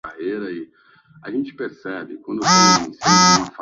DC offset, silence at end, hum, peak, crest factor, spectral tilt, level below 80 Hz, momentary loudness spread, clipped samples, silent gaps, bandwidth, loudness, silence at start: under 0.1%; 0 s; none; 0 dBFS; 20 dB; -2.5 dB/octave; -56 dBFS; 18 LU; under 0.1%; none; 7.8 kHz; -16 LUFS; 0.05 s